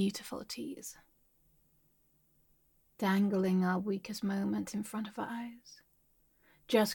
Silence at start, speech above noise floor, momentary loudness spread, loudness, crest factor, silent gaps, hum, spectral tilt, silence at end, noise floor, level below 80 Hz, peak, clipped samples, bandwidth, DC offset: 0 s; 37 dB; 16 LU; -35 LUFS; 20 dB; none; none; -5.5 dB/octave; 0 s; -71 dBFS; -74 dBFS; -16 dBFS; under 0.1%; 17.5 kHz; under 0.1%